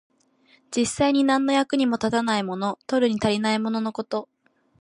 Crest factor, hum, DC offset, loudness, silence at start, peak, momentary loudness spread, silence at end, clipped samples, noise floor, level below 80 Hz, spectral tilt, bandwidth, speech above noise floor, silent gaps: 16 dB; none; under 0.1%; -23 LUFS; 0.7 s; -8 dBFS; 9 LU; 0.55 s; under 0.1%; -60 dBFS; -58 dBFS; -4.5 dB/octave; 11.5 kHz; 38 dB; none